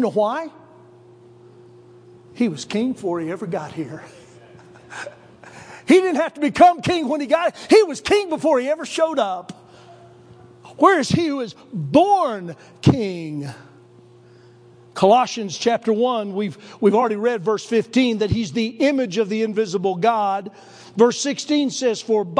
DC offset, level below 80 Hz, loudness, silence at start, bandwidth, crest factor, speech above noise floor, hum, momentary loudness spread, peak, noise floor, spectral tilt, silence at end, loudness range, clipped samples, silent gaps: under 0.1%; -54 dBFS; -19 LUFS; 0 s; 10.5 kHz; 20 dB; 29 dB; none; 16 LU; -2 dBFS; -48 dBFS; -5.5 dB/octave; 0 s; 9 LU; under 0.1%; none